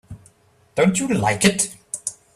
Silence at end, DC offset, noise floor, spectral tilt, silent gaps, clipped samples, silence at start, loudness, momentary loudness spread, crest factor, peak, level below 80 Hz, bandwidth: 0.25 s; under 0.1%; -55 dBFS; -4 dB/octave; none; under 0.1%; 0.1 s; -20 LUFS; 11 LU; 20 dB; -2 dBFS; -52 dBFS; 14 kHz